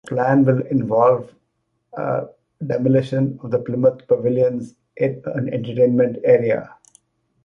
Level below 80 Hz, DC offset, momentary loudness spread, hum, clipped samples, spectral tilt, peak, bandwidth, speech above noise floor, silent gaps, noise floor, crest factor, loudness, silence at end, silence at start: -60 dBFS; under 0.1%; 10 LU; none; under 0.1%; -9.5 dB/octave; -2 dBFS; 7.2 kHz; 53 dB; none; -71 dBFS; 18 dB; -19 LUFS; 0.8 s; 0.05 s